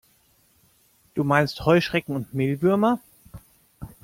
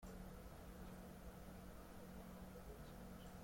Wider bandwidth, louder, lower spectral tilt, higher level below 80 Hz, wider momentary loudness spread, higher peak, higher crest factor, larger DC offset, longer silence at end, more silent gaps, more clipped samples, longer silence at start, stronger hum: about the same, 16.5 kHz vs 16.5 kHz; first, -23 LUFS vs -58 LUFS; about the same, -7 dB/octave vs -6 dB/octave; first, -54 dBFS vs -62 dBFS; first, 12 LU vs 1 LU; first, -6 dBFS vs -44 dBFS; first, 20 dB vs 12 dB; neither; first, 0.15 s vs 0 s; neither; neither; first, 1.15 s vs 0 s; neither